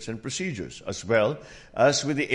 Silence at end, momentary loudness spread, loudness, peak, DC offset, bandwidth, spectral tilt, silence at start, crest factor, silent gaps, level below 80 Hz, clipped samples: 0 s; 14 LU; -26 LUFS; -8 dBFS; under 0.1%; 11.5 kHz; -4 dB/octave; 0 s; 18 dB; none; -56 dBFS; under 0.1%